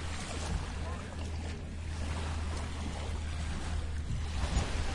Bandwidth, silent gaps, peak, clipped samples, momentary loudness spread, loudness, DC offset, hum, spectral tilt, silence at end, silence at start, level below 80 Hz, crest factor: 11.5 kHz; none; -18 dBFS; under 0.1%; 6 LU; -38 LUFS; under 0.1%; none; -5 dB/octave; 0 s; 0 s; -40 dBFS; 16 dB